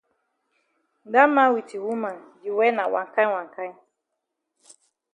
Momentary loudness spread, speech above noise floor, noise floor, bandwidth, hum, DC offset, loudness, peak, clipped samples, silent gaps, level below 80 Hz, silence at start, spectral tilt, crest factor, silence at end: 18 LU; 59 dB; -81 dBFS; 10.5 kHz; none; under 0.1%; -22 LUFS; -4 dBFS; under 0.1%; none; -82 dBFS; 1.05 s; -5 dB/octave; 22 dB; 1.4 s